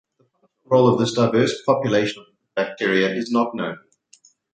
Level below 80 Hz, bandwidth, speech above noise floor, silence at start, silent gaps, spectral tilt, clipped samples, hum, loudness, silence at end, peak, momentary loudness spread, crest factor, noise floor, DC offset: -64 dBFS; 9.2 kHz; 44 dB; 0.7 s; none; -6 dB/octave; under 0.1%; none; -20 LUFS; 0.75 s; -2 dBFS; 13 LU; 18 dB; -64 dBFS; under 0.1%